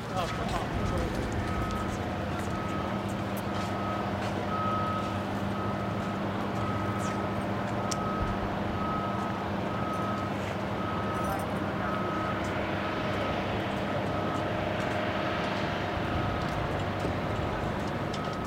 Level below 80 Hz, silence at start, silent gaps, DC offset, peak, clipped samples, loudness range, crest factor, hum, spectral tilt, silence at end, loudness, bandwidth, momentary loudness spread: -44 dBFS; 0 s; none; under 0.1%; -14 dBFS; under 0.1%; 1 LU; 16 dB; none; -6 dB/octave; 0 s; -31 LUFS; 16 kHz; 2 LU